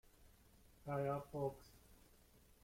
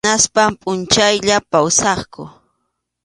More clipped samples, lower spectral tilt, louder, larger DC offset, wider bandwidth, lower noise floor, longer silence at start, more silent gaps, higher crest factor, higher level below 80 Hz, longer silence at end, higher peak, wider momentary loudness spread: neither; first, -7.5 dB/octave vs -2 dB/octave; second, -45 LUFS vs -14 LUFS; neither; first, 16.5 kHz vs 11.5 kHz; about the same, -69 dBFS vs -72 dBFS; first, 0.2 s vs 0.05 s; neither; about the same, 20 dB vs 16 dB; second, -70 dBFS vs -46 dBFS; about the same, 0.7 s vs 0.75 s; second, -30 dBFS vs 0 dBFS; first, 24 LU vs 10 LU